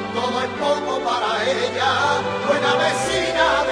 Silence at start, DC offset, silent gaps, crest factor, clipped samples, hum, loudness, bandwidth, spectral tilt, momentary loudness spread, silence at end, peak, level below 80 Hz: 0 s; under 0.1%; none; 16 dB; under 0.1%; none; -20 LUFS; 11 kHz; -3 dB/octave; 4 LU; 0 s; -4 dBFS; -50 dBFS